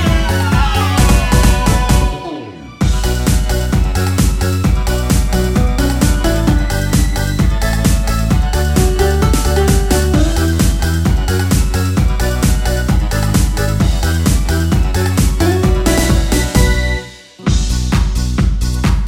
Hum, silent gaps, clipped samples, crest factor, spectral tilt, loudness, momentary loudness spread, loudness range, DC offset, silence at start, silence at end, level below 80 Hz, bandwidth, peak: none; none; under 0.1%; 12 dB; -5.5 dB/octave; -14 LUFS; 3 LU; 1 LU; under 0.1%; 0 s; 0 s; -16 dBFS; 16.5 kHz; 0 dBFS